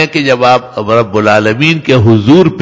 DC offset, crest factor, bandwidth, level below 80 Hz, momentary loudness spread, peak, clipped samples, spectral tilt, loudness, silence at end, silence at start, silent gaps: under 0.1%; 8 dB; 8 kHz; -38 dBFS; 5 LU; 0 dBFS; 2%; -6.5 dB/octave; -8 LUFS; 0 s; 0 s; none